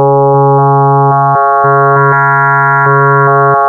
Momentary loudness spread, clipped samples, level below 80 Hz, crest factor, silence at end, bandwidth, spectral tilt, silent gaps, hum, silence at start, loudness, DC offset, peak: 1 LU; under 0.1%; -54 dBFS; 4 dB; 0 s; 2.5 kHz; -11 dB/octave; none; none; 0 s; -7 LUFS; under 0.1%; -2 dBFS